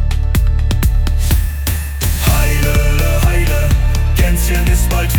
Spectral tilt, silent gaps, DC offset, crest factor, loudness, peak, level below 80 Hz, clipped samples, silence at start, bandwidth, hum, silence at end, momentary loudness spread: -5 dB/octave; none; under 0.1%; 10 dB; -15 LUFS; -2 dBFS; -14 dBFS; under 0.1%; 0 s; 19.5 kHz; none; 0 s; 3 LU